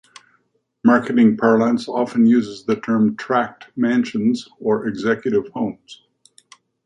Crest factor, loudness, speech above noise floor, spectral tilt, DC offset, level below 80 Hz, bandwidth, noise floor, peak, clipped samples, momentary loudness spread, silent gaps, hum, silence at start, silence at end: 16 dB; -19 LUFS; 47 dB; -7 dB/octave; under 0.1%; -62 dBFS; 9.2 kHz; -65 dBFS; -2 dBFS; under 0.1%; 9 LU; none; none; 0.85 s; 0.9 s